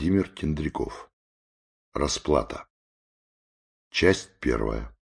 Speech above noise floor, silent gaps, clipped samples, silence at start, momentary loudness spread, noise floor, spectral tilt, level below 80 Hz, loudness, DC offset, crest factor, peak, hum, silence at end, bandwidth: over 64 dB; 1.13-1.92 s, 2.70-3.91 s; under 0.1%; 0 s; 14 LU; under -90 dBFS; -5 dB/octave; -40 dBFS; -27 LUFS; under 0.1%; 24 dB; -4 dBFS; none; 0.15 s; 10.5 kHz